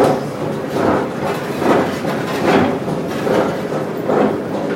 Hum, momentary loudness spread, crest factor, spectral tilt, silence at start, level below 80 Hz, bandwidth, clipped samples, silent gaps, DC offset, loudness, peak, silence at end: none; 6 LU; 16 dB; -6 dB/octave; 0 s; -50 dBFS; 16.5 kHz; under 0.1%; none; under 0.1%; -18 LUFS; 0 dBFS; 0 s